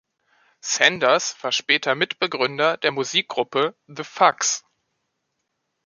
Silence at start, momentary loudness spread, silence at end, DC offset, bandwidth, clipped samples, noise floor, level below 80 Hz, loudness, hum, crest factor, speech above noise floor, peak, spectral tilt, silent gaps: 0.65 s; 8 LU; 1.25 s; under 0.1%; 10 kHz; under 0.1%; -76 dBFS; -72 dBFS; -20 LUFS; none; 22 dB; 55 dB; -2 dBFS; -1.5 dB/octave; none